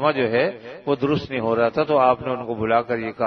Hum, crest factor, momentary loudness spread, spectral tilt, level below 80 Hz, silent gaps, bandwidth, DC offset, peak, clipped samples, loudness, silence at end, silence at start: none; 16 dB; 8 LU; -8 dB/octave; -56 dBFS; none; 6.4 kHz; under 0.1%; -4 dBFS; under 0.1%; -21 LUFS; 0 s; 0 s